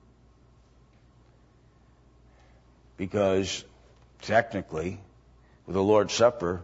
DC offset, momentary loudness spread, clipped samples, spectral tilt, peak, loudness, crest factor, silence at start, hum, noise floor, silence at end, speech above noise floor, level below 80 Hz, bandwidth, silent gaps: under 0.1%; 14 LU; under 0.1%; -5 dB/octave; -8 dBFS; -26 LUFS; 22 dB; 3 s; none; -59 dBFS; 0 s; 33 dB; -58 dBFS; 8 kHz; none